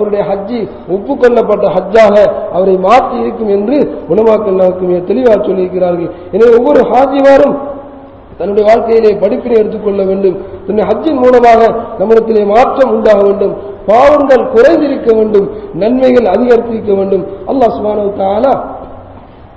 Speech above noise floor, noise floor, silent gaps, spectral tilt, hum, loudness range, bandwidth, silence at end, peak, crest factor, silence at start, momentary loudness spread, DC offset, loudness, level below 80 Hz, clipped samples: 24 dB; -32 dBFS; none; -7.5 dB/octave; none; 3 LU; 8 kHz; 0.3 s; 0 dBFS; 8 dB; 0 s; 10 LU; 0.2%; -9 LUFS; -38 dBFS; 4%